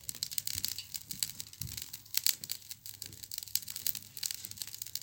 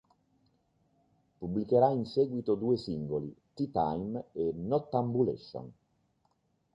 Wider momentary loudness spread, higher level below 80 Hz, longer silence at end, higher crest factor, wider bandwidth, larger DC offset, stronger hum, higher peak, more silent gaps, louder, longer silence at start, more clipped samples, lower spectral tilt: second, 11 LU vs 16 LU; about the same, -66 dBFS vs -62 dBFS; second, 0 s vs 1 s; first, 34 dB vs 20 dB; first, 17.5 kHz vs 7.6 kHz; neither; neither; first, -4 dBFS vs -12 dBFS; neither; second, -36 LUFS vs -32 LUFS; second, 0 s vs 1.4 s; neither; second, 0.5 dB/octave vs -9.5 dB/octave